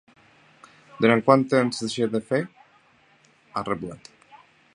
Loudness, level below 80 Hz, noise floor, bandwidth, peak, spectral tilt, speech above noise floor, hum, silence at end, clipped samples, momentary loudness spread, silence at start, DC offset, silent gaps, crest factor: -23 LUFS; -64 dBFS; -59 dBFS; 11 kHz; -2 dBFS; -6 dB/octave; 37 dB; none; 0.4 s; under 0.1%; 17 LU; 1 s; under 0.1%; none; 24 dB